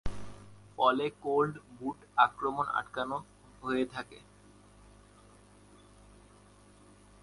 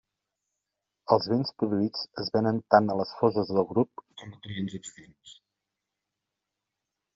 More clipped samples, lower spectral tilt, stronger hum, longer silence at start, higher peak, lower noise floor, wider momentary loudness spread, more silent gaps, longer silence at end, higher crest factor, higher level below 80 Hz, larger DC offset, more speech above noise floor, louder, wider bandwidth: neither; about the same, -5.5 dB/octave vs -5 dB/octave; first, 50 Hz at -65 dBFS vs none; second, 0.05 s vs 1.1 s; second, -8 dBFS vs -4 dBFS; second, -59 dBFS vs -86 dBFS; about the same, 21 LU vs 21 LU; neither; first, 3.05 s vs 1.85 s; about the same, 26 dB vs 24 dB; first, -54 dBFS vs -70 dBFS; neither; second, 27 dB vs 59 dB; second, -32 LUFS vs -27 LUFS; first, 11.5 kHz vs 7.6 kHz